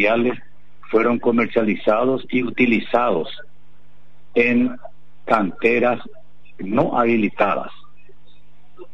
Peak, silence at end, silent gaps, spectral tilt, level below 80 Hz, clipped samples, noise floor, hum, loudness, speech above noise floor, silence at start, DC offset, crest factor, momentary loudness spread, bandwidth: -4 dBFS; 0.1 s; none; -8 dB/octave; -58 dBFS; under 0.1%; -55 dBFS; none; -19 LUFS; 36 dB; 0 s; 3%; 16 dB; 13 LU; 6.2 kHz